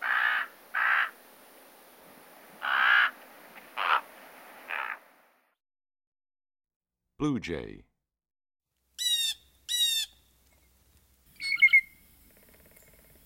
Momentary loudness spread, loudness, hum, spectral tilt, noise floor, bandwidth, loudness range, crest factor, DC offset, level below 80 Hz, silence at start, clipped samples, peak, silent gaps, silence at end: 18 LU; -26 LUFS; none; -1.5 dB/octave; -65 dBFS; 16 kHz; 13 LU; 22 dB; under 0.1%; -64 dBFS; 0 s; under 0.1%; -10 dBFS; 6.07-6.12 s, 6.76-6.81 s; 1.4 s